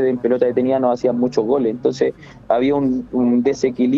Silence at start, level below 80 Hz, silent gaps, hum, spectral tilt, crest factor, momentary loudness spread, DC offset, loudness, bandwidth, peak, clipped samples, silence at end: 0 s; -52 dBFS; none; none; -7 dB/octave; 14 dB; 3 LU; under 0.1%; -18 LUFS; 7.6 kHz; -4 dBFS; under 0.1%; 0 s